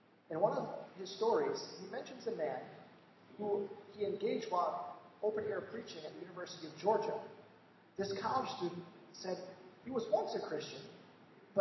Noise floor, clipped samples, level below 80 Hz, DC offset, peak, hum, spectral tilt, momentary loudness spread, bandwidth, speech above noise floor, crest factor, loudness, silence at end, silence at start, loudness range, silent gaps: -63 dBFS; under 0.1%; -82 dBFS; under 0.1%; -18 dBFS; none; -5 dB/octave; 16 LU; 6.2 kHz; 25 dB; 22 dB; -40 LUFS; 0 s; 0.3 s; 2 LU; none